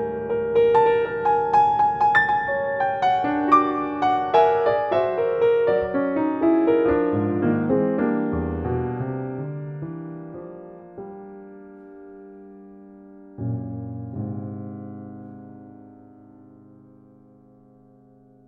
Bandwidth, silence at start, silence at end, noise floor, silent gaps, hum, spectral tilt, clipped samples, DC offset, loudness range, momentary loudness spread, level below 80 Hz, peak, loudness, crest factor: 7.4 kHz; 0 s; 2.55 s; -53 dBFS; none; none; -8.5 dB/octave; under 0.1%; under 0.1%; 18 LU; 23 LU; -52 dBFS; -4 dBFS; -21 LUFS; 18 dB